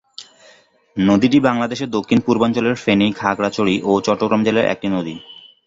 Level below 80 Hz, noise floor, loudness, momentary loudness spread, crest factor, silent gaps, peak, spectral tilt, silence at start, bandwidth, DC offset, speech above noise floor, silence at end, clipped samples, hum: -52 dBFS; -51 dBFS; -17 LUFS; 11 LU; 16 dB; none; -2 dBFS; -6 dB/octave; 0.2 s; 7.8 kHz; under 0.1%; 34 dB; 0.35 s; under 0.1%; none